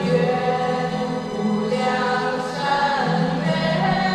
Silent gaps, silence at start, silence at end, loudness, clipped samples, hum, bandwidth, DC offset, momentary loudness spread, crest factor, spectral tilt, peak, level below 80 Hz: none; 0 s; 0 s; -21 LUFS; under 0.1%; none; 11.5 kHz; under 0.1%; 4 LU; 14 dB; -6 dB/octave; -6 dBFS; -50 dBFS